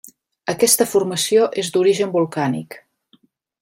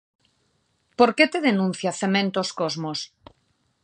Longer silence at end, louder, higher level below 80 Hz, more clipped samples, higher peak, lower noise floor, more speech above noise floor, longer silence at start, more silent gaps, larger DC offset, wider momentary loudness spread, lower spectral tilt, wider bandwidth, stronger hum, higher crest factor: about the same, 0.85 s vs 0.75 s; first, -18 LUFS vs -22 LUFS; about the same, -64 dBFS vs -68 dBFS; neither; about the same, 0 dBFS vs -2 dBFS; second, -58 dBFS vs -69 dBFS; second, 41 dB vs 47 dB; second, 0.45 s vs 1 s; neither; neither; about the same, 13 LU vs 13 LU; about the same, -3.5 dB/octave vs -4.5 dB/octave; first, 16 kHz vs 9.6 kHz; neither; about the same, 20 dB vs 22 dB